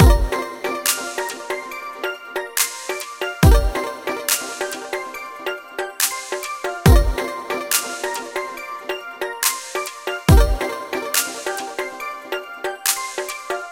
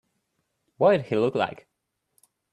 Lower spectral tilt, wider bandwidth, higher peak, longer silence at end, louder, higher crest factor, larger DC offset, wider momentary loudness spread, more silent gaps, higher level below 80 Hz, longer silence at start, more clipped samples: second, -4 dB/octave vs -7.5 dB/octave; first, 17 kHz vs 12 kHz; first, 0 dBFS vs -8 dBFS; second, 0 s vs 1 s; about the same, -22 LUFS vs -24 LUFS; about the same, 20 dB vs 20 dB; neither; first, 13 LU vs 7 LU; neither; first, -24 dBFS vs -68 dBFS; second, 0 s vs 0.8 s; neither